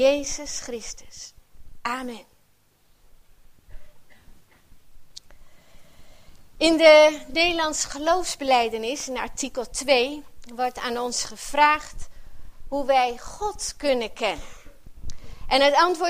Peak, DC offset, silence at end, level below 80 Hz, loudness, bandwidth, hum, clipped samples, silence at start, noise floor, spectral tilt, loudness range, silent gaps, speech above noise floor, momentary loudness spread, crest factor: -2 dBFS; under 0.1%; 0 s; -44 dBFS; -22 LUFS; 15.5 kHz; none; under 0.1%; 0 s; -60 dBFS; -2 dB/octave; 18 LU; none; 38 dB; 21 LU; 22 dB